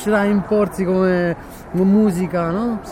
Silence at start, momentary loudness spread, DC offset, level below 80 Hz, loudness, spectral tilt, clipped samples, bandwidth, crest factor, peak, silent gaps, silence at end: 0 s; 8 LU; under 0.1%; -42 dBFS; -18 LUFS; -7.5 dB/octave; under 0.1%; 15.5 kHz; 12 dB; -6 dBFS; none; 0 s